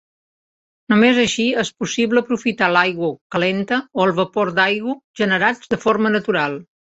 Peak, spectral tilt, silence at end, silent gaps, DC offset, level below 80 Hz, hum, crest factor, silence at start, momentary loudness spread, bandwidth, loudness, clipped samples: -2 dBFS; -4.5 dB/octave; 0.25 s; 3.21-3.30 s, 5.04-5.14 s; under 0.1%; -58 dBFS; none; 18 dB; 0.9 s; 7 LU; 8.2 kHz; -18 LUFS; under 0.1%